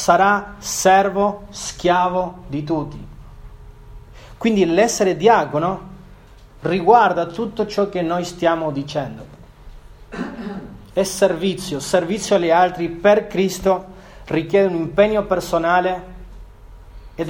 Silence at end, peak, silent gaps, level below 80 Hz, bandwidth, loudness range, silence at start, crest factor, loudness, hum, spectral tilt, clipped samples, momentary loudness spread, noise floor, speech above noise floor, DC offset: 0 s; 0 dBFS; none; -42 dBFS; 17.5 kHz; 6 LU; 0 s; 18 dB; -18 LUFS; none; -4.5 dB/octave; under 0.1%; 15 LU; -43 dBFS; 26 dB; under 0.1%